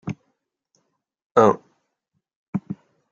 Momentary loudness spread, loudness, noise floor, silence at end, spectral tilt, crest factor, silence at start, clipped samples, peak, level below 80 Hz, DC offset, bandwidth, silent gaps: 20 LU; -21 LUFS; -77 dBFS; 0.35 s; -7.5 dB/octave; 24 dB; 0.05 s; under 0.1%; -2 dBFS; -70 dBFS; under 0.1%; 7.6 kHz; 1.26-1.35 s, 2.36-2.53 s